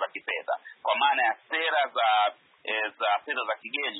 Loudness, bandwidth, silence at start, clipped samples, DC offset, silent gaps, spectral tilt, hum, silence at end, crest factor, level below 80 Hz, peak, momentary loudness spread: -27 LUFS; 4.1 kHz; 0 s; under 0.1%; under 0.1%; none; -4.5 dB/octave; none; 0 s; 16 dB; under -90 dBFS; -12 dBFS; 8 LU